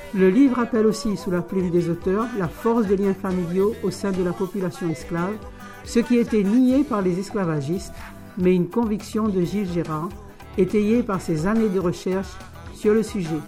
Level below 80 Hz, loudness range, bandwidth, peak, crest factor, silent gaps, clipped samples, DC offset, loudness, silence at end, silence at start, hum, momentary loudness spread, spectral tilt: -44 dBFS; 3 LU; 16 kHz; -8 dBFS; 14 dB; none; under 0.1%; under 0.1%; -22 LUFS; 0 s; 0 s; none; 11 LU; -7 dB/octave